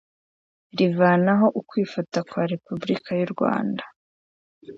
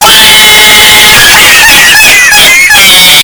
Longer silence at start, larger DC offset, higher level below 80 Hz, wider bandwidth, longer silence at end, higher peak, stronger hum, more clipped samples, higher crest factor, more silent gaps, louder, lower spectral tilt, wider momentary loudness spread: first, 0.75 s vs 0 s; neither; second, -68 dBFS vs -26 dBFS; second, 7.6 kHz vs over 20 kHz; about the same, 0 s vs 0 s; second, -6 dBFS vs 0 dBFS; neither; second, under 0.1% vs 80%; first, 18 dB vs 0 dB; first, 3.96-4.61 s vs none; second, -23 LUFS vs 2 LUFS; first, -7.5 dB/octave vs 0.5 dB/octave; first, 11 LU vs 1 LU